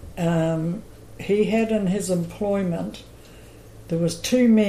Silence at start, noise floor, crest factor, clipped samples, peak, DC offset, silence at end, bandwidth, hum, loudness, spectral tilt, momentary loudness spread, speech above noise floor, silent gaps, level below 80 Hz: 0 s; -44 dBFS; 14 dB; under 0.1%; -8 dBFS; under 0.1%; 0 s; 15 kHz; none; -23 LUFS; -6 dB/octave; 12 LU; 23 dB; none; -48 dBFS